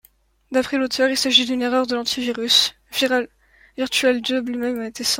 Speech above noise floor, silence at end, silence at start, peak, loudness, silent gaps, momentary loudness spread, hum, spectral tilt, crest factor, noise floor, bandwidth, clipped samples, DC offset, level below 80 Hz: 35 dB; 0 s; 0.5 s; -2 dBFS; -19 LUFS; none; 9 LU; none; -1 dB/octave; 18 dB; -56 dBFS; 16.5 kHz; under 0.1%; under 0.1%; -58 dBFS